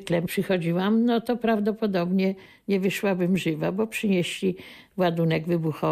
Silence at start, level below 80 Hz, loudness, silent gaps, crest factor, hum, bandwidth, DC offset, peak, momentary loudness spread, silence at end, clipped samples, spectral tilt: 0 s; -62 dBFS; -25 LUFS; none; 12 dB; none; 15 kHz; under 0.1%; -12 dBFS; 5 LU; 0 s; under 0.1%; -6.5 dB/octave